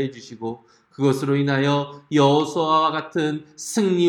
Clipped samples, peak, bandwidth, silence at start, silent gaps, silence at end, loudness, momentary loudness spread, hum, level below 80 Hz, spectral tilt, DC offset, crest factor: under 0.1%; -4 dBFS; 17.5 kHz; 0 s; none; 0 s; -21 LUFS; 14 LU; none; -70 dBFS; -5.5 dB/octave; under 0.1%; 18 dB